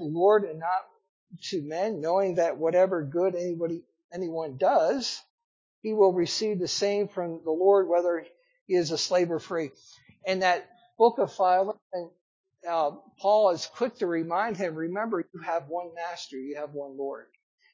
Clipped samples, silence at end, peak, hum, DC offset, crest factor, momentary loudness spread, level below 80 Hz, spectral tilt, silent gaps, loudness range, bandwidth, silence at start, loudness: under 0.1%; 0.5 s; -8 dBFS; none; under 0.1%; 20 dB; 14 LU; -76 dBFS; -4.5 dB/octave; 1.09-1.27 s, 4.04-4.09 s, 5.30-5.38 s, 5.44-5.82 s, 8.61-8.66 s, 11.82-11.90 s, 12.21-12.44 s; 3 LU; 7.6 kHz; 0 s; -27 LUFS